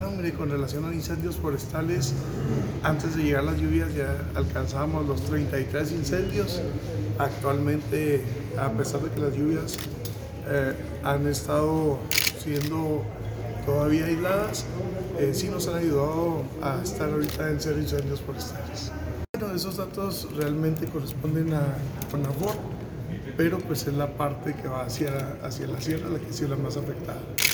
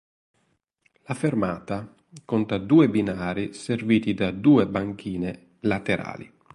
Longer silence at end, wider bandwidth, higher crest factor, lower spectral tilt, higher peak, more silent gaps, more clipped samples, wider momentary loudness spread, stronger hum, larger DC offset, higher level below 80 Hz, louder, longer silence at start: second, 0 s vs 0.3 s; first, over 20 kHz vs 11.5 kHz; first, 24 dB vs 18 dB; second, -5.5 dB/octave vs -7 dB/octave; about the same, -4 dBFS vs -6 dBFS; first, 19.29-19.34 s vs none; neither; second, 7 LU vs 14 LU; neither; neither; first, -44 dBFS vs -54 dBFS; second, -28 LUFS vs -24 LUFS; second, 0 s vs 1.1 s